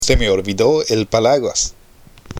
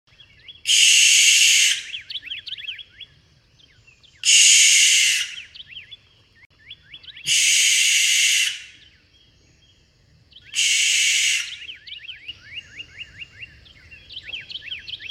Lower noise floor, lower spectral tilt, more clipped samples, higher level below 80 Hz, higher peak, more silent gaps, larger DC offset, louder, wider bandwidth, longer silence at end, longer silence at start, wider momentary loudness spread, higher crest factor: second, -44 dBFS vs -57 dBFS; first, -3.5 dB/octave vs 5 dB/octave; neither; first, -28 dBFS vs -62 dBFS; about the same, 0 dBFS vs -2 dBFS; second, none vs 6.46-6.50 s; neither; about the same, -16 LUFS vs -14 LUFS; about the same, 15.5 kHz vs 16.5 kHz; about the same, 0 s vs 0 s; second, 0 s vs 0.5 s; second, 5 LU vs 25 LU; about the same, 16 dB vs 20 dB